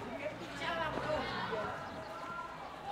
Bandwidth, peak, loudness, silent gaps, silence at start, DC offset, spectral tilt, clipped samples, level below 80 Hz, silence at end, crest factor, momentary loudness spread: 16 kHz; -20 dBFS; -39 LUFS; none; 0 s; under 0.1%; -5 dB/octave; under 0.1%; -60 dBFS; 0 s; 20 dB; 8 LU